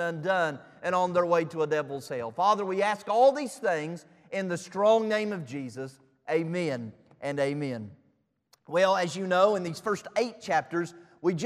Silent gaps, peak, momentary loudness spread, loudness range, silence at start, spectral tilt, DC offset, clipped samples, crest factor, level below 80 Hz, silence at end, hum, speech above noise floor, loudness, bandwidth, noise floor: none; -10 dBFS; 14 LU; 5 LU; 0 s; -5.5 dB/octave; under 0.1%; under 0.1%; 20 dB; -76 dBFS; 0 s; none; 43 dB; -28 LUFS; 13.5 kHz; -70 dBFS